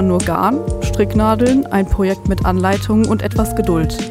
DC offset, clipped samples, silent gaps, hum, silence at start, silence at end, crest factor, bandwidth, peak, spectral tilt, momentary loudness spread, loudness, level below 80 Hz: under 0.1%; under 0.1%; none; none; 0 s; 0 s; 14 dB; 16 kHz; -2 dBFS; -6.5 dB/octave; 4 LU; -16 LUFS; -26 dBFS